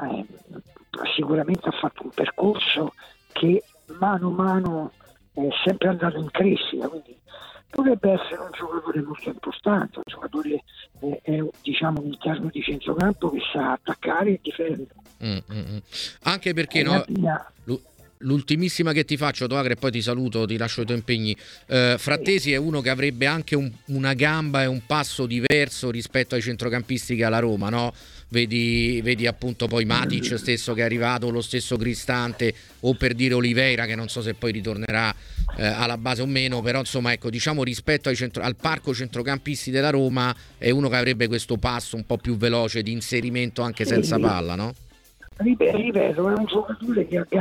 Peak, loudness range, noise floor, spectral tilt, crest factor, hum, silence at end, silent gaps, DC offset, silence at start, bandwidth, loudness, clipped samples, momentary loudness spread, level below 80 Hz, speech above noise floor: -2 dBFS; 3 LU; -48 dBFS; -5.5 dB/octave; 22 dB; none; 0 s; none; under 0.1%; 0 s; 16.5 kHz; -24 LUFS; under 0.1%; 10 LU; -44 dBFS; 25 dB